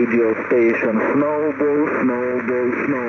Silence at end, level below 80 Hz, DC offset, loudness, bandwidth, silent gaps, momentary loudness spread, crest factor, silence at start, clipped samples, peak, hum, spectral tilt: 0 s; -60 dBFS; under 0.1%; -18 LUFS; 6.6 kHz; none; 4 LU; 10 dB; 0 s; under 0.1%; -8 dBFS; none; -9 dB/octave